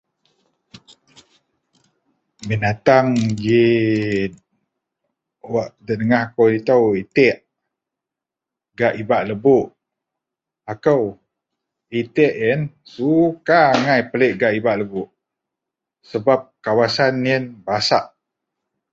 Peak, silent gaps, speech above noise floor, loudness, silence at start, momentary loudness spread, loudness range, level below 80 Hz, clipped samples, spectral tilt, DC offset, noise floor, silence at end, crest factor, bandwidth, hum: 0 dBFS; none; 69 dB; -18 LUFS; 2.4 s; 12 LU; 4 LU; -56 dBFS; under 0.1%; -6.5 dB/octave; under 0.1%; -86 dBFS; 0.85 s; 18 dB; 8 kHz; none